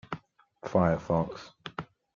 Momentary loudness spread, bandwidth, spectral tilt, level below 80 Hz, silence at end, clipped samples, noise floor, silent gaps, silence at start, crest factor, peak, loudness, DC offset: 17 LU; 7.2 kHz; -8 dB/octave; -56 dBFS; 0.3 s; under 0.1%; -53 dBFS; none; 0.1 s; 22 dB; -10 dBFS; -29 LUFS; under 0.1%